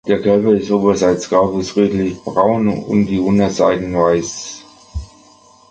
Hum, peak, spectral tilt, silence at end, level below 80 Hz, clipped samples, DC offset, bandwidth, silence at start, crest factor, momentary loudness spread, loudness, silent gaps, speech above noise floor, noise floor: 50 Hz at -35 dBFS; 0 dBFS; -6 dB/octave; 0.65 s; -40 dBFS; under 0.1%; under 0.1%; 8.8 kHz; 0.05 s; 14 dB; 16 LU; -15 LUFS; none; 32 dB; -47 dBFS